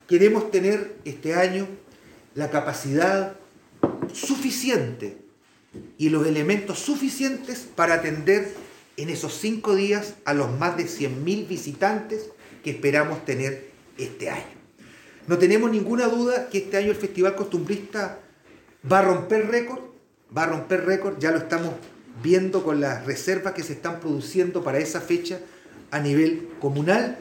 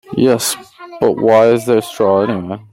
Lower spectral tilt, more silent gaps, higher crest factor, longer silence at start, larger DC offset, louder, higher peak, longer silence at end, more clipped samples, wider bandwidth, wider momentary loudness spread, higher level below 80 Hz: about the same, -5.5 dB/octave vs -5 dB/octave; neither; first, 20 dB vs 12 dB; about the same, 0.1 s vs 0.1 s; neither; second, -24 LUFS vs -14 LUFS; about the same, -4 dBFS vs -2 dBFS; about the same, 0 s vs 0.1 s; neither; about the same, 17 kHz vs 16.5 kHz; first, 14 LU vs 9 LU; second, -66 dBFS vs -56 dBFS